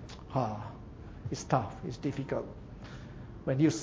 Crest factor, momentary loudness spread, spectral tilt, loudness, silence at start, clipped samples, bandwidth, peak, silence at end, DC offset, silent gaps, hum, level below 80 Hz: 24 dB; 16 LU; -6.5 dB/octave; -35 LUFS; 0 s; under 0.1%; 8 kHz; -10 dBFS; 0 s; under 0.1%; none; none; -52 dBFS